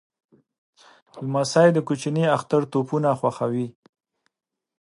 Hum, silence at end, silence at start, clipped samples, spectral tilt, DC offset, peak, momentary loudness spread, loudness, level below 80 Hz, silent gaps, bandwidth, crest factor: none; 1.1 s; 1.15 s; under 0.1%; -6.5 dB/octave; under 0.1%; -4 dBFS; 10 LU; -22 LUFS; -70 dBFS; none; 11.5 kHz; 20 dB